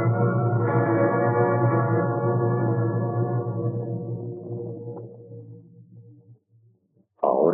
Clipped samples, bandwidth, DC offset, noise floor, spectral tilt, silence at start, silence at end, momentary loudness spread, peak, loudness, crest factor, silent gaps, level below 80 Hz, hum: under 0.1%; 2.5 kHz; under 0.1%; -64 dBFS; -12 dB/octave; 0 s; 0 s; 16 LU; -8 dBFS; -24 LUFS; 16 dB; none; -72 dBFS; none